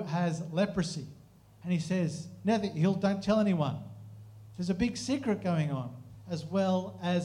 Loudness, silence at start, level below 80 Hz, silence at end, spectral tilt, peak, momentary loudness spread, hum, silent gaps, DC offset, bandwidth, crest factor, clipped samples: -31 LUFS; 0 s; -60 dBFS; 0 s; -6.5 dB/octave; -16 dBFS; 18 LU; none; none; under 0.1%; 11 kHz; 16 dB; under 0.1%